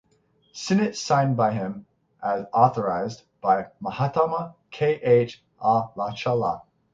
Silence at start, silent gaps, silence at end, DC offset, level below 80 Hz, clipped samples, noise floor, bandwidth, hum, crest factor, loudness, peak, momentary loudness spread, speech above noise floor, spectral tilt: 0.55 s; none; 0.3 s; under 0.1%; -62 dBFS; under 0.1%; -64 dBFS; 7.8 kHz; none; 20 dB; -24 LUFS; -4 dBFS; 13 LU; 42 dB; -6 dB/octave